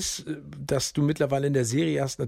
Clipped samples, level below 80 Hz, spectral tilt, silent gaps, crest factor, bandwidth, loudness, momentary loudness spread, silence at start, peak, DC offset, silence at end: under 0.1%; -52 dBFS; -5 dB/octave; none; 14 dB; 16 kHz; -26 LUFS; 10 LU; 0 s; -12 dBFS; under 0.1%; 0 s